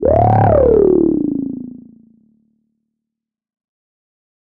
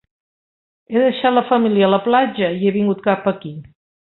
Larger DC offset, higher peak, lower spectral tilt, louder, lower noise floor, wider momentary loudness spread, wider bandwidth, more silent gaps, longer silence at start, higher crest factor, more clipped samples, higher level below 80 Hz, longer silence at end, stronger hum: neither; about the same, -2 dBFS vs -2 dBFS; about the same, -12.5 dB/octave vs -11.5 dB/octave; first, -13 LUFS vs -17 LUFS; second, -82 dBFS vs under -90 dBFS; first, 16 LU vs 9 LU; second, 3.4 kHz vs 4.2 kHz; neither; second, 0 s vs 0.9 s; about the same, 14 dB vs 16 dB; neither; first, -34 dBFS vs -60 dBFS; first, 2.7 s vs 0.5 s; neither